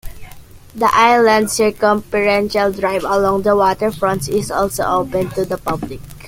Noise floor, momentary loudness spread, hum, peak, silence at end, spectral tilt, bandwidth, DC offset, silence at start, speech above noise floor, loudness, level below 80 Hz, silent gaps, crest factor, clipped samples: -36 dBFS; 9 LU; none; 0 dBFS; 0 s; -4.5 dB/octave; 17 kHz; under 0.1%; 0.05 s; 20 dB; -16 LUFS; -40 dBFS; none; 16 dB; under 0.1%